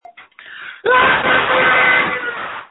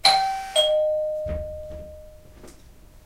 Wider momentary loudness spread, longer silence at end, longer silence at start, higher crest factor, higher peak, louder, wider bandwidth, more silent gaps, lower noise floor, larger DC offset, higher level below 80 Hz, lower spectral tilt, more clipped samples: second, 15 LU vs 20 LU; about the same, 0.05 s vs 0.05 s; first, 0.2 s vs 0.05 s; second, 16 dB vs 24 dB; about the same, 0 dBFS vs -2 dBFS; first, -13 LUFS vs -23 LUFS; second, 4.1 kHz vs 16 kHz; neither; second, -40 dBFS vs -48 dBFS; neither; second, -50 dBFS vs -42 dBFS; first, -8 dB/octave vs -1.5 dB/octave; neither